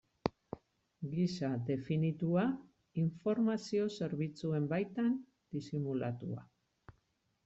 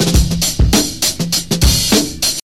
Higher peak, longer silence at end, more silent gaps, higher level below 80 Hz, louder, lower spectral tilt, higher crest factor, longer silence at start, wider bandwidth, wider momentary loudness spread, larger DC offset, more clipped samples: second, -14 dBFS vs 0 dBFS; first, 1 s vs 0.05 s; neither; second, -70 dBFS vs -20 dBFS; second, -37 LUFS vs -13 LUFS; first, -8 dB/octave vs -3.5 dB/octave; first, 22 dB vs 14 dB; first, 0.25 s vs 0 s; second, 8 kHz vs 16.5 kHz; first, 12 LU vs 4 LU; second, under 0.1% vs 1%; neither